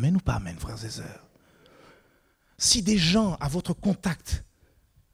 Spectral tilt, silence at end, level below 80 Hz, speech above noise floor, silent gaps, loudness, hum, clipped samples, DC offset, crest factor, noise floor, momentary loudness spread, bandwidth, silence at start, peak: -4 dB/octave; 0.7 s; -42 dBFS; 39 dB; none; -26 LUFS; none; under 0.1%; under 0.1%; 22 dB; -65 dBFS; 15 LU; 16 kHz; 0 s; -6 dBFS